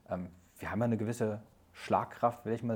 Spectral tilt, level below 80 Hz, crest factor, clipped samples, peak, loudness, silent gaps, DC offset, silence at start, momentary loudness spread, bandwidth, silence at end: -7 dB/octave; -66 dBFS; 20 dB; under 0.1%; -14 dBFS; -35 LUFS; none; under 0.1%; 0.1 s; 12 LU; 18 kHz; 0 s